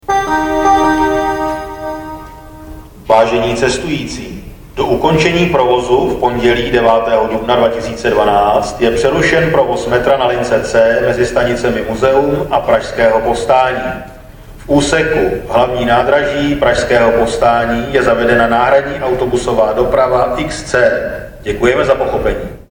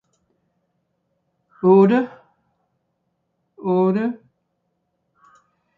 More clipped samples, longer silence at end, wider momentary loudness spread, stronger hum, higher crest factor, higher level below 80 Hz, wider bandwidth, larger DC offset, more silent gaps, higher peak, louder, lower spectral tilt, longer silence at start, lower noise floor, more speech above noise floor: neither; second, 0.1 s vs 1.6 s; second, 11 LU vs 17 LU; neither; second, 12 dB vs 18 dB; first, -32 dBFS vs -72 dBFS; first, 18 kHz vs 4.6 kHz; neither; neither; first, 0 dBFS vs -4 dBFS; first, -12 LUFS vs -18 LUFS; second, -5 dB/octave vs -10 dB/octave; second, 0.1 s vs 1.65 s; second, -33 dBFS vs -73 dBFS; second, 21 dB vs 57 dB